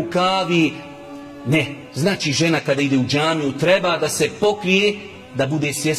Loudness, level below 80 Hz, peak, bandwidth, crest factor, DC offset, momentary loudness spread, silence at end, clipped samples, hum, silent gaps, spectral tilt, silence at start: -19 LUFS; -54 dBFS; -2 dBFS; 15.5 kHz; 16 dB; under 0.1%; 14 LU; 0 s; under 0.1%; none; none; -4.5 dB/octave; 0 s